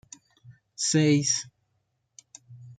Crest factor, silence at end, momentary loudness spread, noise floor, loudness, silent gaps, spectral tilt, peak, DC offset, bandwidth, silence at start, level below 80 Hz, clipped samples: 18 dB; 0.05 s; 24 LU; -75 dBFS; -24 LUFS; none; -4 dB/octave; -10 dBFS; under 0.1%; 9.4 kHz; 0.5 s; -72 dBFS; under 0.1%